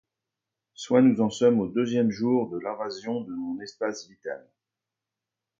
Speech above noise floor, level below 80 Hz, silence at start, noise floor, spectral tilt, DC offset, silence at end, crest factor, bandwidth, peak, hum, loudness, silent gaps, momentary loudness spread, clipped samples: 63 dB; -68 dBFS; 0.8 s; -88 dBFS; -6.5 dB/octave; under 0.1%; 1.2 s; 20 dB; 7.6 kHz; -8 dBFS; none; -25 LUFS; none; 17 LU; under 0.1%